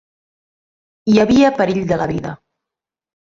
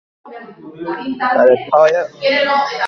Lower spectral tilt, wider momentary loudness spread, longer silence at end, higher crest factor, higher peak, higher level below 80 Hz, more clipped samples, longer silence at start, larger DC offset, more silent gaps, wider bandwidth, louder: first, -6.5 dB/octave vs -4.5 dB/octave; second, 13 LU vs 17 LU; first, 0.95 s vs 0 s; about the same, 16 dB vs 16 dB; about the same, -2 dBFS vs 0 dBFS; first, -46 dBFS vs -60 dBFS; neither; first, 1.05 s vs 0.25 s; neither; neither; about the same, 7.6 kHz vs 7 kHz; about the same, -15 LUFS vs -14 LUFS